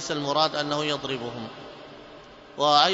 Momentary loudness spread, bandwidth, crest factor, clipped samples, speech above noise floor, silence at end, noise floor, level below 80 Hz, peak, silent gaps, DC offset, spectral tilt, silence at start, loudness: 23 LU; 8 kHz; 22 dB; under 0.1%; 22 dB; 0 s; -46 dBFS; -64 dBFS; -4 dBFS; none; under 0.1%; -3.5 dB/octave; 0 s; -25 LUFS